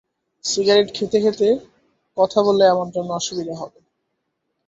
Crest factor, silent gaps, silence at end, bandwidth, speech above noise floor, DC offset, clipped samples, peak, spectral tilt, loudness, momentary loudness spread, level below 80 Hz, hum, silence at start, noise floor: 18 dB; none; 1 s; 8 kHz; 56 dB; under 0.1%; under 0.1%; -2 dBFS; -4 dB/octave; -19 LUFS; 14 LU; -62 dBFS; none; 0.45 s; -74 dBFS